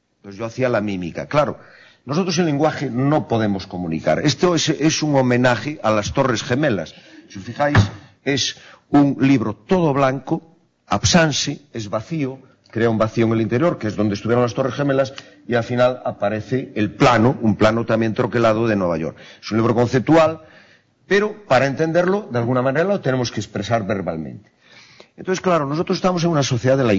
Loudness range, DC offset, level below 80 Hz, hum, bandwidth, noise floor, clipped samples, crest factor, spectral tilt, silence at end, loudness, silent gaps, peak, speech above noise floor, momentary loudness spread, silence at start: 3 LU; under 0.1%; -48 dBFS; none; 7.8 kHz; -53 dBFS; under 0.1%; 14 dB; -5.5 dB/octave; 0 s; -19 LUFS; none; -4 dBFS; 34 dB; 11 LU; 0.25 s